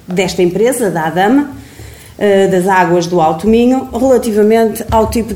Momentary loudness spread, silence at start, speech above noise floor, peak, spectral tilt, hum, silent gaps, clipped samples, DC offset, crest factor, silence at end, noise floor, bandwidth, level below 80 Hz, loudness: 4 LU; 0.1 s; 22 dB; 0 dBFS; -5.5 dB/octave; none; none; under 0.1%; 0.2%; 12 dB; 0 s; -33 dBFS; 17 kHz; -34 dBFS; -11 LUFS